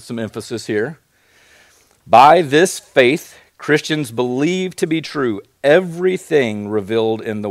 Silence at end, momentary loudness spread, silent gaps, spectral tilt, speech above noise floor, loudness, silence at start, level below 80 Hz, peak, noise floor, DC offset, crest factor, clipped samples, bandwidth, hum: 0 s; 13 LU; none; -5 dB/octave; 37 dB; -16 LUFS; 0.05 s; -60 dBFS; 0 dBFS; -53 dBFS; under 0.1%; 16 dB; 0.2%; 15.5 kHz; none